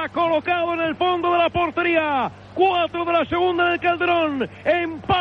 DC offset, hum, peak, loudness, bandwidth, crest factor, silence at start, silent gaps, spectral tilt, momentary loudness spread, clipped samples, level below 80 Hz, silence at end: under 0.1%; none; -6 dBFS; -20 LUFS; 6.2 kHz; 14 dB; 0 s; none; -7 dB/octave; 4 LU; under 0.1%; -52 dBFS; 0 s